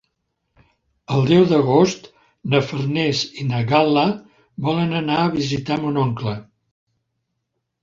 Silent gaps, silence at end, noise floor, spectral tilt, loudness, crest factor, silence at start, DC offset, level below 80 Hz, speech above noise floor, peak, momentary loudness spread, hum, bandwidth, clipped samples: none; 1.4 s; -76 dBFS; -6.5 dB/octave; -19 LUFS; 18 dB; 1.1 s; under 0.1%; -54 dBFS; 58 dB; -2 dBFS; 12 LU; none; 7.8 kHz; under 0.1%